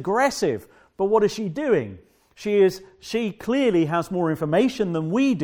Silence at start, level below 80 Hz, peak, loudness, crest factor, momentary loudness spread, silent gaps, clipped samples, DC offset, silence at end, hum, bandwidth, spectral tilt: 0 s; -58 dBFS; -6 dBFS; -22 LUFS; 16 dB; 8 LU; none; under 0.1%; under 0.1%; 0 s; none; 17.5 kHz; -6 dB/octave